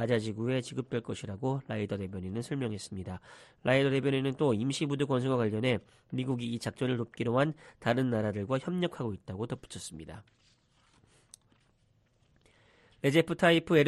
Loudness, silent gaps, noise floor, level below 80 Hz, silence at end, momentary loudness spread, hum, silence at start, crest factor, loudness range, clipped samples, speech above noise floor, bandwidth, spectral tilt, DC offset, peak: -32 LUFS; none; -69 dBFS; -64 dBFS; 0 s; 13 LU; none; 0 s; 20 dB; 11 LU; under 0.1%; 38 dB; 13 kHz; -6 dB/octave; under 0.1%; -12 dBFS